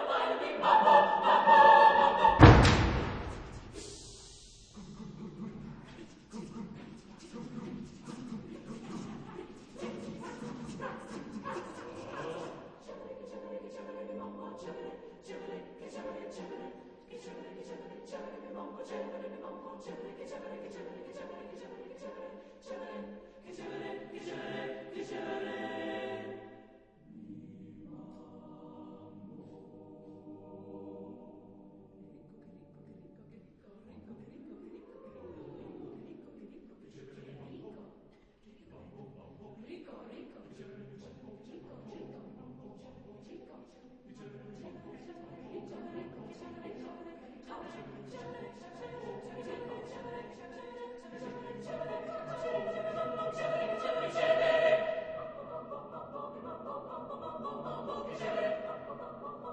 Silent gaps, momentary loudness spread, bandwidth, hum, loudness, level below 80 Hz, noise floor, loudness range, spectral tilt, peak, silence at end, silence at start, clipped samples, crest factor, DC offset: none; 23 LU; 9.6 kHz; none; -31 LUFS; -48 dBFS; -61 dBFS; 19 LU; -6.5 dB/octave; -2 dBFS; 0 s; 0 s; under 0.1%; 32 dB; under 0.1%